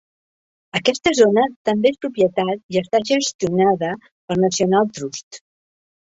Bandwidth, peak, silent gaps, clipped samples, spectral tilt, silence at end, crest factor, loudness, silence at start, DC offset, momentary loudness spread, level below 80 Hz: 8 kHz; -2 dBFS; 1.56-1.65 s, 2.63-2.69 s, 3.35-3.39 s, 4.11-4.28 s, 5.23-5.31 s; under 0.1%; -4.5 dB/octave; 0.75 s; 18 dB; -19 LUFS; 0.75 s; under 0.1%; 11 LU; -58 dBFS